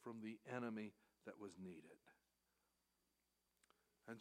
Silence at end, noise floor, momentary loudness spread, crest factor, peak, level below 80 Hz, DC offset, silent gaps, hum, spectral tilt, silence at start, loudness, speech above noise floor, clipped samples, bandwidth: 0 s; -88 dBFS; 14 LU; 24 dB; -32 dBFS; under -90 dBFS; under 0.1%; none; 60 Hz at -85 dBFS; -6.5 dB/octave; 0 s; -54 LUFS; 34 dB; under 0.1%; 15 kHz